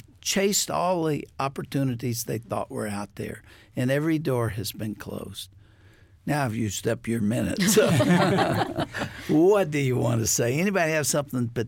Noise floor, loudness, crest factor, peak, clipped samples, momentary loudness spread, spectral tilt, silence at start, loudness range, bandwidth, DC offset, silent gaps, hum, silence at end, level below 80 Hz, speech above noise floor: -54 dBFS; -25 LUFS; 16 dB; -10 dBFS; under 0.1%; 15 LU; -4.5 dB/octave; 0.25 s; 7 LU; 17 kHz; under 0.1%; none; none; 0 s; -54 dBFS; 29 dB